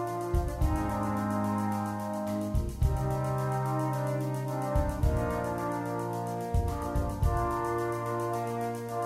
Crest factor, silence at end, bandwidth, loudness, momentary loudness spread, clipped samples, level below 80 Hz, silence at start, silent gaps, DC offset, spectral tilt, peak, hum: 16 dB; 0 s; 16 kHz; -31 LUFS; 4 LU; under 0.1%; -36 dBFS; 0 s; none; under 0.1%; -7.5 dB/octave; -14 dBFS; none